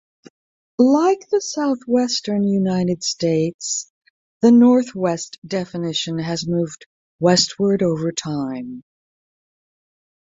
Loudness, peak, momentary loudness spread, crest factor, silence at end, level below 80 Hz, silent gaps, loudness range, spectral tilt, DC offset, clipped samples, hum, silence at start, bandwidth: -19 LUFS; -2 dBFS; 12 LU; 18 dB; 1.45 s; -60 dBFS; 3.54-3.59 s, 3.90-4.01 s, 4.10-4.40 s, 5.38-5.42 s, 6.86-7.19 s; 3 LU; -5 dB/octave; under 0.1%; under 0.1%; none; 0.8 s; 7.8 kHz